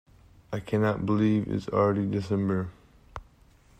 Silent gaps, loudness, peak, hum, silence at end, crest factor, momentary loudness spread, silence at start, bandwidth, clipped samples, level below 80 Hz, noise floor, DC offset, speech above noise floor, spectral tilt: none; -27 LUFS; -12 dBFS; none; 0.6 s; 16 dB; 21 LU; 0.5 s; 8.8 kHz; under 0.1%; -54 dBFS; -58 dBFS; under 0.1%; 32 dB; -8.5 dB/octave